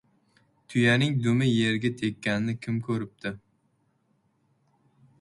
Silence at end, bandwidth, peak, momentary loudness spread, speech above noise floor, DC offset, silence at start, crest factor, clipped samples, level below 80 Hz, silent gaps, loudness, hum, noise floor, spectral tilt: 1.85 s; 11.5 kHz; -10 dBFS; 13 LU; 45 dB; under 0.1%; 0.7 s; 18 dB; under 0.1%; -62 dBFS; none; -26 LUFS; none; -70 dBFS; -6 dB/octave